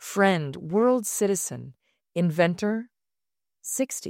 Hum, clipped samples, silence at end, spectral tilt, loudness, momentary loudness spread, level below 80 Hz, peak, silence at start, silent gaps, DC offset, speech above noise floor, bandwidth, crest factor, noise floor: none; under 0.1%; 0 s; -5 dB/octave; -25 LUFS; 11 LU; -70 dBFS; -8 dBFS; 0 s; none; under 0.1%; over 65 dB; 16 kHz; 18 dB; under -90 dBFS